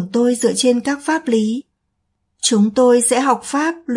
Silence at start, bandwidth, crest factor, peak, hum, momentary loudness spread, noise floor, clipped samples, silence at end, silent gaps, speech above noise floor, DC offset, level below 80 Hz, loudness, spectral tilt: 0 s; 11.5 kHz; 16 dB; -2 dBFS; none; 7 LU; -71 dBFS; under 0.1%; 0 s; none; 55 dB; under 0.1%; -62 dBFS; -16 LUFS; -3.5 dB/octave